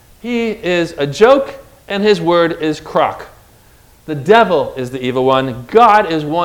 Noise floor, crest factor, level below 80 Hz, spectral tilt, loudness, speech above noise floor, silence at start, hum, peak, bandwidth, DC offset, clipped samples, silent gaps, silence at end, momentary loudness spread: -46 dBFS; 14 dB; -46 dBFS; -5.5 dB/octave; -13 LUFS; 33 dB; 0.25 s; none; 0 dBFS; 16.5 kHz; under 0.1%; 0.4%; none; 0 s; 12 LU